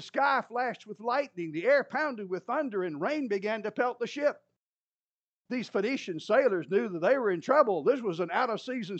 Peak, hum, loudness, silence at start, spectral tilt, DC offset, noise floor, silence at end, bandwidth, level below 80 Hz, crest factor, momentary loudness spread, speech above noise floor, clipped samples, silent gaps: -10 dBFS; none; -29 LUFS; 0 s; -5.5 dB/octave; under 0.1%; under -90 dBFS; 0 s; 8.4 kHz; under -90 dBFS; 20 dB; 9 LU; over 61 dB; under 0.1%; 4.56-5.39 s